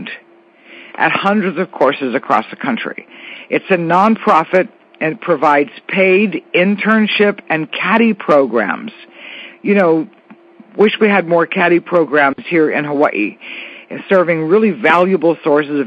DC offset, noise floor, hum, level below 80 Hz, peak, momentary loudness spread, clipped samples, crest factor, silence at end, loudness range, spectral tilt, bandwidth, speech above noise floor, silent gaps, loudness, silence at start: under 0.1%; -46 dBFS; none; -68 dBFS; 0 dBFS; 17 LU; under 0.1%; 14 dB; 0 s; 2 LU; -7.5 dB/octave; 7.4 kHz; 32 dB; none; -14 LUFS; 0 s